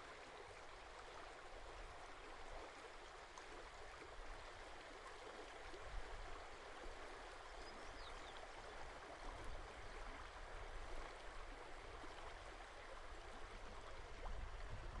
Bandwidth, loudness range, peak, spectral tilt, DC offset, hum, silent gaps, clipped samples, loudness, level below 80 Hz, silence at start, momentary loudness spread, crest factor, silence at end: 11 kHz; 1 LU; -36 dBFS; -3.5 dB/octave; under 0.1%; none; none; under 0.1%; -56 LUFS; -58 dBFS; 0 s; 2 LU; 16 dB; 0 s